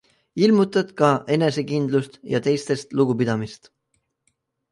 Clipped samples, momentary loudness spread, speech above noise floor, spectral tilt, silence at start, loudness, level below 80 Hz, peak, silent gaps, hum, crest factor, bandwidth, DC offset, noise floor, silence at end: under 0.1%; 8 LU; 52 dB; -6.5 dB/octave; 0.35 s; -21 LUFS; -62 dBFS; -2 dBFS; none; none; 20 dB; 11.5 kHz; under 0.1%; -72 dBFS; 1.15 s